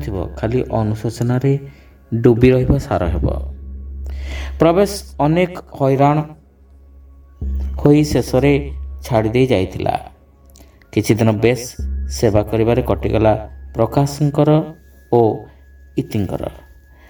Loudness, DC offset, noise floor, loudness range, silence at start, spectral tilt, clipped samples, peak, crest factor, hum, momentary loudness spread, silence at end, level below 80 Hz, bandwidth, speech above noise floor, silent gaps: -17 LUFS; under 0.1%; -45 dBFS; 2 LU; 0 s; -7 dB/octave; under 0.1%; 0 dBFS; 18 dB; none; 14 LU; 0.5 s; -30 dBFS; 19.5 kHz; 30 dB; none